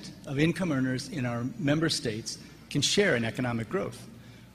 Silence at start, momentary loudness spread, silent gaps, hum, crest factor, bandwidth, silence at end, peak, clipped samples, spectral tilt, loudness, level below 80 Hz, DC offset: 0 s; 14 LU; none; none; 20 dB; 15 kHz; 0.05 s; -10 dBFS; under 0.1%; -4.5 dB/octave; -29 LUFS; -56 dBFS; under 0.1%